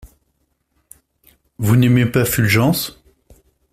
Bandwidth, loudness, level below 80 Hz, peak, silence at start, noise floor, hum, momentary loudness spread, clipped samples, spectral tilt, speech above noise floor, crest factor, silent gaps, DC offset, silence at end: 16 kHz; -16 LUFS; -46 dBFS; -2 dBFS; 1.6 s; -67 dBFS; none; 9 LU; under 0.1%; -5.5 dB/octave; 53 dB; 16 dB; none; under 0.1%; 0.8 s